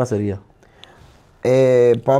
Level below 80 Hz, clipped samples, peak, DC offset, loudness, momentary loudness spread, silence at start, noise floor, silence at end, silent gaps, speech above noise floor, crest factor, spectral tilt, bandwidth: -54 dBFS; under 0.1%; -2 dBFS; under 0.1%; -16 LUFS; 13 LU; 0 s; -48 dBFS; 0 s; none; 33 dB; 14 dB; -7.5 dB/octave; 11 kHz